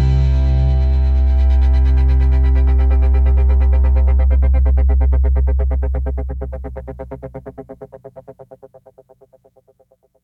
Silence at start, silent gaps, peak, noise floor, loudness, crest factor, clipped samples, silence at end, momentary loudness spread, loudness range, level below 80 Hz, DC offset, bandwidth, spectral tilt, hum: 0 s; none; -6 dBFS; -57 dBFS; -15 LUFS; 8 dB; under 0.1%; 1.6 s; 17 LU; 18 LU; -14 dBFS; under 0.1%; 4.3 kHz; -9.5 dB/octave; none